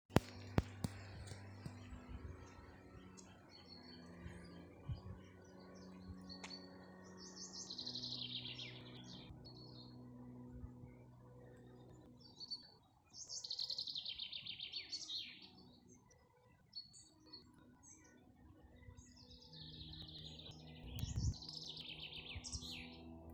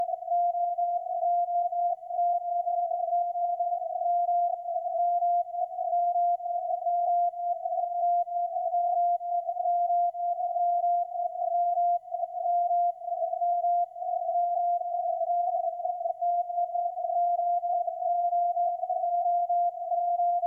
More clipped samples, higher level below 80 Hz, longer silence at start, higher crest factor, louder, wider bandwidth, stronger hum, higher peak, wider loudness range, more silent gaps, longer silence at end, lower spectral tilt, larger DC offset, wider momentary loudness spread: neither; first, -60 dBFS vs -84 dBFS; about the same, 0.1 s vs 0 s; first, 40 dB vs 8 dB; second, -49 LUFS vs -28 LUFS; first, 19.5 kHz vs 0.9 kHz; second, none vs 50 Hz at -85 dBFS; first, -10 dBFS vs -20 dBFS; first, 12 LU vs 1 LU; neither; about the same, 0 s vs 0 s; second, -4 dB/octave vs -5.5 dB/octave; neither; first, 19 LU vs 4 LU